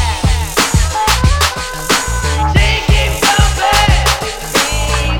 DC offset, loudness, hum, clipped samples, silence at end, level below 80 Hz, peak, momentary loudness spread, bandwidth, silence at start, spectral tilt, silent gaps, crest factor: under 0.1%; -13 LUFS; none; under 0.1%; 0 s; -16 dBFS; 0 dBFS; 4 LU; over 20 kHz; 0 s; -3.5 dB/octave; none; 12 dB